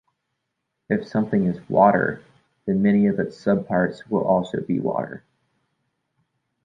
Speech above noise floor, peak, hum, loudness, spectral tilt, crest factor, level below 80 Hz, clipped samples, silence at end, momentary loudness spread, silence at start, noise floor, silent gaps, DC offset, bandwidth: 58 dB; -4 dBFS; none; -22 LUFS; -9 dB/octave; 20 dB; -58 dBFS; under 0.1%; 1.45 s; 11 LU; 0.9 s; -78 dBFS; none; under 0.1%; 7.4 kHz